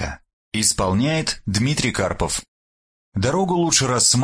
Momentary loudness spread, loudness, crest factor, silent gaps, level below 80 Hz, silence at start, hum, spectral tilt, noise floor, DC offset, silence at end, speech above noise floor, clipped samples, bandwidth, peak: 11 LU; -20 LUFS; 18 dB; 0.33-0.52 s, 2.48-3.12 s; -40 dBFS; 0 s; none; -3.5 dB/octave; under -90 dBFS; under 0.1%; 0 s; over 71 dB; under 0.1%; 10.5 kHz; -4 dBFS